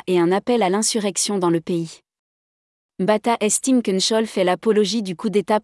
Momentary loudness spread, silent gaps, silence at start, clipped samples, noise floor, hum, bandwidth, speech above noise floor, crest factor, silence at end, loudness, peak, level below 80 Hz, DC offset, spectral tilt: 5 LU; 2.19-2.89 s; 0.05 s; under 0.1%; under -90 dBFS; none; 12 kHz; over 71 dB; 14 dB; 0 s; -19 LUFS; -6 dBFS; -68 dBFS; under 0.1%; -4 dB/octave